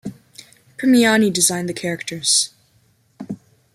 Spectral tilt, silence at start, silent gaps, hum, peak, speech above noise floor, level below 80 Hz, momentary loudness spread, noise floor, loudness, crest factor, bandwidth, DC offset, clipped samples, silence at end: -2.5 dB/octave; 0.05 s; none; none; -2 dBFS; 42 dB; -64 dBFS; 20 LU; -59 dBFS; -17 LUFS; 20 dB; 15 kHz; under 0.1%; under 0.1%; 0.4 s